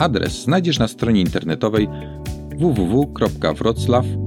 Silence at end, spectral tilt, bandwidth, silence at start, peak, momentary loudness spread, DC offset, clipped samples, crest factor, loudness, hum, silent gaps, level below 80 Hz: 0 s; -6.5 dB/octave; 17.5 kHz; 0 s; -2 dBFS; 8 LU; under 0.1%; under 0.1%; 16 dB; -19 LUFS; none; none; -36 dBFS